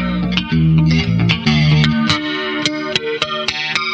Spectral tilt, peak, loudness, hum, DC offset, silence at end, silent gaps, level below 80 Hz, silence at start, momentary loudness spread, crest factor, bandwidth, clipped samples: -5.5 dB/octave; 0 dBFS; -15 LUFS; none; under 0.1%; 0 s; none; -34 dBFS; 0 s; 6 LU; 16 dB; 8.6 kHz; under 0.1%